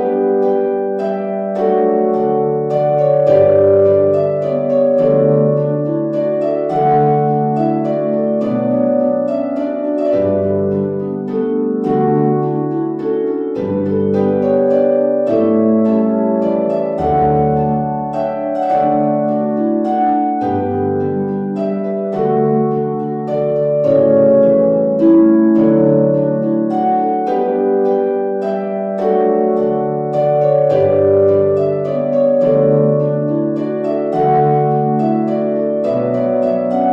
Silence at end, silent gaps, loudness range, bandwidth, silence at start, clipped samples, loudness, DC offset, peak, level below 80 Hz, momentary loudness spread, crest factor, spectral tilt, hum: 0 s; none; 4 LU; 5.6 kHz; 0 s; under 0.1%; -15 LUFS; under 0.1%; -2 dBFS; -50 dBFS; 7 LU; 12 dB; -10.5 dB/octave; none